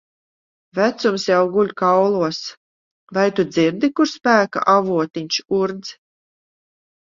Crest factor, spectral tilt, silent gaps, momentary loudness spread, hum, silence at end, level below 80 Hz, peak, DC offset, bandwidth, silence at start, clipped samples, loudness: 18 dB; -5 dB/octave; 2.57-3.07 s; 10 LU; none; 1.1 s; -64 dBFS; -2 dBFS; under 0.1%; 7.6 kHz; 0.75 s; under 0.1%; -18 LUFS